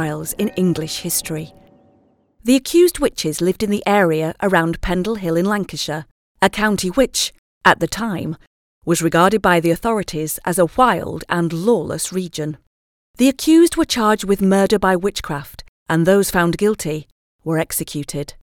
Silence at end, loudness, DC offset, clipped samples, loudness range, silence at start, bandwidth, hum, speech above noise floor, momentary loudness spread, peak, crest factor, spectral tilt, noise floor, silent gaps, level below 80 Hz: 0.25 s; -18 LUFS; under 0.1%; under 0.1%; 3 LU; 0 s; 18 kHz; none; 40 dB; 13 LU; 0 dBFS; 18 dB; -4.5 dB/octave; -57 dBFS; 6.11-6.35 s, 7.38-7.61 s, 8.47-8.81 s, 12.67-13.14 s, 15.68-15.86 s, 17.12-17.39 s; -42 dBFS